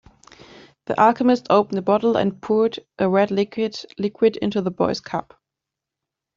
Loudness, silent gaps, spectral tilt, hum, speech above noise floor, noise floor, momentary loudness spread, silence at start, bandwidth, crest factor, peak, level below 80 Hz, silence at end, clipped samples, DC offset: -21 LUFS; none; -6.5 dB/octave; none; 65 dB; -85 dBFS; 10 LU; 0.9 s; 7.6 kHz; 18 dB; -2 dBFS; -62 dBFS; 1.15 s; under 0.1%; under 0.1%